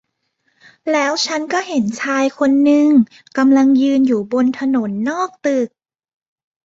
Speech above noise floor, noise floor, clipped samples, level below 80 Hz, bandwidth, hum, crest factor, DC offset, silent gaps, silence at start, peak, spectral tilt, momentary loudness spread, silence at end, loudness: 52 dB; -67 dBFS; under 0.1%; -62 dBFS; 7.8 kHz; none; 14 dB; under 0.1%; none; 0.85 s; -2 dBFS; -4.5 dB/octave; 9 LU; 1 s; -16 LUFS